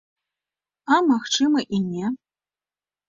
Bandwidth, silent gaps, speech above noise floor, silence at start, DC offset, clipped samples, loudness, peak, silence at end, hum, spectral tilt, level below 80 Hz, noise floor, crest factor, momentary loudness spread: 7.6 kHz; none; over 69 dB; 0.85 s; under 0.1%; under 0.1%; -21 LUFS; -4 dBFS; 0.9 s; none; -4 dB/octave; -66 dBFS; under -90 dBFS; 20 dB; 13 LU